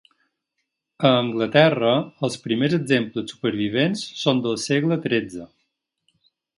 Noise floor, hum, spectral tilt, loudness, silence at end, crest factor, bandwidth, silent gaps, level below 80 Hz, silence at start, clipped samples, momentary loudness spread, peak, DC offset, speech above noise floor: -78 dBFS; none; -5.5 dB/octave; -21 LUFS; 1.1 s; 22 dB; 11.5 kHz; none; -64 dBFS; 1 s; under 0.1%; 10 LU; 0 dBFS; under 0.1%; 57 dB